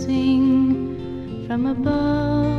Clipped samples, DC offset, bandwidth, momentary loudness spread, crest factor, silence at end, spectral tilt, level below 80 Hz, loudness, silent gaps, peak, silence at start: under 0.1%; under 0.1%; 6.6 kHz; 13 LU; 12 dB; 0 s; -8 dB/octave; -40 dBFS; -20 LUFS; none; -8 dBFS; 0 s